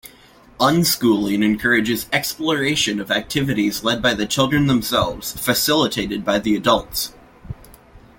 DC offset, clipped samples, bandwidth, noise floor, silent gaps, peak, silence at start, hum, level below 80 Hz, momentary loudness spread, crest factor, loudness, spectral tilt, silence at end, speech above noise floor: under 0.1%; under 0.1%; 17 kHz; -48 dBFS; none; -2 dBFS; 0.05 s; none; -44 dBFS; 7 LU; 16 dB; -19 LUFS; -4 dB/octave; 0.2 s; 29 dB